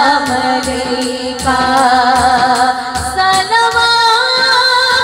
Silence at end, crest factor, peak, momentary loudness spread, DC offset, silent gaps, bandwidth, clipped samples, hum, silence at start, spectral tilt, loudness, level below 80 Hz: 0 s; 12 dB; 0 dBFS; 8 LU; under 0.1%; none; 16.5 kHz; under 0.1%; none; 0 s; -2 dB/octave; -11 LUFS; -36 dBFS